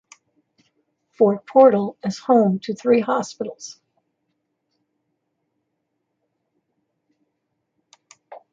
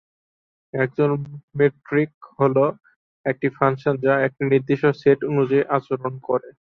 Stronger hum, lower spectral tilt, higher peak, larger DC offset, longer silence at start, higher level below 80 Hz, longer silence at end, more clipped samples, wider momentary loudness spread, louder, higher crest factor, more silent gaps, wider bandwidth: neither; second, -6.5 dB/octave vs -9.5 dB/octave; about the same, -2 dBFS vs -4 dBFS; neither; first, 1.2 s vs 0.75 s; second, -72 dBFS vs -62 dBFS; about the same, 0.15 s vs 0.15 s; neither; first, 17 LU vs 9 LU; first, -18 LUFS vs -21 LUFS; about the same, 22 dB vs 18 dB; second, none vs 1.43-1.48 s, 2.14-2.21 s, 2.96-3.24 s; first, 7.6 kHz vs 5.8 kHz